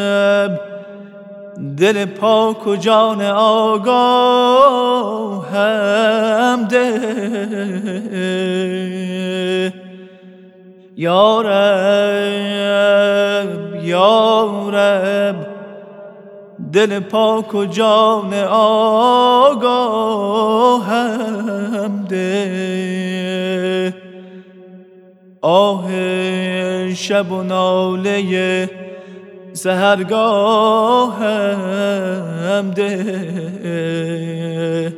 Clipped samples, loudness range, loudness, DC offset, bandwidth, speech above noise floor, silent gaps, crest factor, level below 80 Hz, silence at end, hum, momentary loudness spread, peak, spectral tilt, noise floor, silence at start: under 0.1%; 7 LU; -15 LUFS; under 0.1%; 15 kHz; 30 dB; none; 16 dB; -74 dBFS; 0 s; none; 11 LU; 0 dBFS; -5.5 dB/octave; -44 dBFS; 0 s